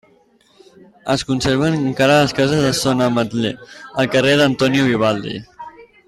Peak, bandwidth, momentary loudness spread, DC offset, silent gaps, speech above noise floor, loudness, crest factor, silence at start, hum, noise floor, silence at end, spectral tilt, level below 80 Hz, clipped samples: -4 dBFS; 15 kHz; 17 LU; under 0.1%; none; 38 dB; -16 LUFS; 14 dB; 1.05 s; none; -54 dBFS; 0.25 s; -5 dB/octave; -48 dBFS; under 0.1%